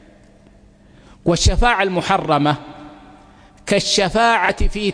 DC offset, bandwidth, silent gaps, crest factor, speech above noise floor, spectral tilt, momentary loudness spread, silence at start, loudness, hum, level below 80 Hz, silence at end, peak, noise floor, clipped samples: under 0.1%; 10.5 kHz; none; 18 dB; 32 dB; -4 dB/octave; 11 LU; 1.25 s; -17 LUFS; none; -26 dBFS; 0 s; -2 dBFS; -48 dBFS; under 0.1%